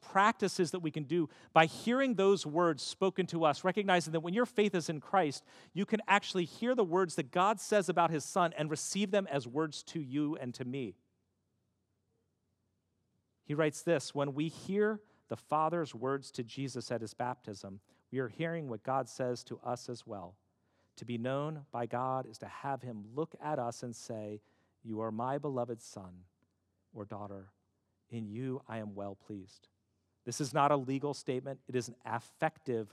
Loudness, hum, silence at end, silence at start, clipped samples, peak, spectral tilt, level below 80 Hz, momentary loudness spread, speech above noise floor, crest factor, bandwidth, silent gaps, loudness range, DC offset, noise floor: -35 LUFS; none; 0.05 s; 0.05 s; under 0.1%; -10 dBFS; -5 dB/octave; -84 dBFS; 15 LU; 46 dB; 26 dB; 14 kHz; none; 11 LU; under 0.1%; -80 dBFS